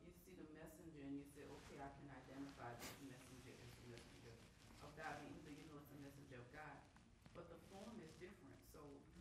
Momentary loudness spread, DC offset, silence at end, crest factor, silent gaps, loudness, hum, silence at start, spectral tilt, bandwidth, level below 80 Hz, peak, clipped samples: 9 LU; under 0.1%; 0 s; 20 dB; none; -59 LUFS; none; 0 s; -5 dB/octave; 15 kHz; -74 dBFS; -40 dBFS; under 0.1%